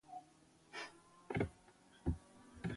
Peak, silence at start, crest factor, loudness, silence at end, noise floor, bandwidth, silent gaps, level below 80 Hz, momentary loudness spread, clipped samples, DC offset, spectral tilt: -24 dBFS; 0.05 s; 22 dB; -46 LUFS; 0 s; -68 dBFS; 11.5 kHz; none; -56 dBFS; 23 LU; under 0.1%; under 0.1%; -6.5 dB/octave